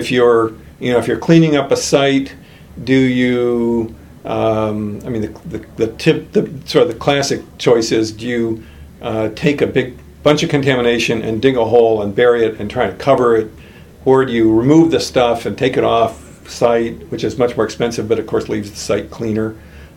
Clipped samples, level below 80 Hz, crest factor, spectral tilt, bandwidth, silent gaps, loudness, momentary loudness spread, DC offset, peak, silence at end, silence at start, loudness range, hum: under 0.1%; -42 dBFS; 16 dB; -5.5 dB/octave; 16 kHz; none; -15 LUFS; 11 LU; under 0.1%; 0 dBFS; 0.1 s; 0 s; 4 LU; none